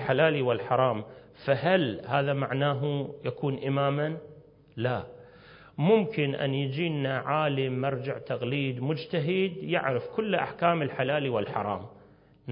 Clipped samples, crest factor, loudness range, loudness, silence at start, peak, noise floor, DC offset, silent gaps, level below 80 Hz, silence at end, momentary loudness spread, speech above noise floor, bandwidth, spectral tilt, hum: under 0.1%; 18 dB; 2 LU; -28 LUFS; 0 s; -10 dBFS; -56 dBFS; under 0.1%; none; -64 dBFS; 0 s; 10 LU; 29 dB; 5.4 kHz; -10.5 dB/octave; none